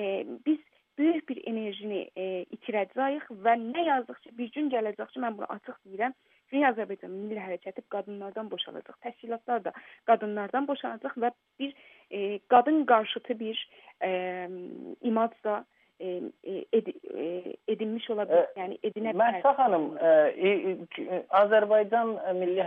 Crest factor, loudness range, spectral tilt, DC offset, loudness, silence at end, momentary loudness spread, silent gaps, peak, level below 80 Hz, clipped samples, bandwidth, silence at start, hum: 22 dB; 8 LU; -8 dB/octave; under 0.1%; -29 LUFS; 0 s; 15 LU; none; -8 dBFS; -86 dBFS; under 0.1%; 3.9 kHz; 0 s; none